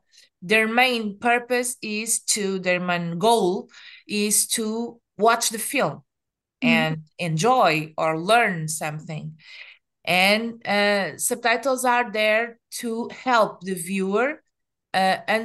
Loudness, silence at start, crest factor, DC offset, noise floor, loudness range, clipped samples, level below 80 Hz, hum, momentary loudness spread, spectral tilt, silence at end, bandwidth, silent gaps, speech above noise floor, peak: -22 LUFS; 0.4 s; 20 dB; under 0.1%; -84 dBFS; 2 LU; under 0.1%; -72 dBFS; none; 12 LU; -3 dB/octave; 0 s; 12.5 kHz; none; 62 dB; -4 dBFS